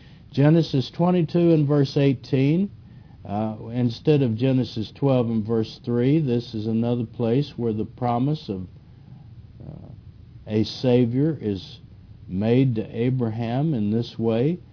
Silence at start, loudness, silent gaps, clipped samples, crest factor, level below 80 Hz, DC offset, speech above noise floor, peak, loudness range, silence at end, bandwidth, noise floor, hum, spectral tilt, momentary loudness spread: 0.1 s; -23 LUFS; none; under 0.1%; 16 dB; -54 dBFS; under 0.1%; 23 dB; -6 dBFS; 5 LU; 0.15 s; 5.4 kHz; -45 dBFS; none; -9 dB/octave; 12 LU